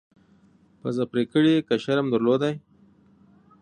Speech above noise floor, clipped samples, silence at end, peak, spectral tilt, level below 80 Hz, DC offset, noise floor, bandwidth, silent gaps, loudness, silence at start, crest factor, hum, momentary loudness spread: 36 dB; under 0.1%; 1.05 s; -8 dBFS; -7 dB/octave; -68 dBFS; under 0.1%; -58 dBFS; 9.8 kHz; none; -23 LUFS; 0.85 s; 16 dB; none; 10 LU